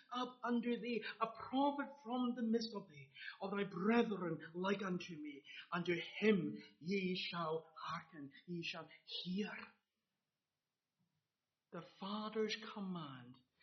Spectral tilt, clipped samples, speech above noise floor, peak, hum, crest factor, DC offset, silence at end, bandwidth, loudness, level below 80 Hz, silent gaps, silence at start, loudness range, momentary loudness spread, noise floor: -4 dB/octave; under 0.1%; over 48 dB; -22 dBFS; none; 22 dB; under 0.1%; 0.3 s; 6.2 kHz; -42 LUFS; -86 dBFS; none; 0.1 s; 9 LU; 16 LU; under -90 dBFS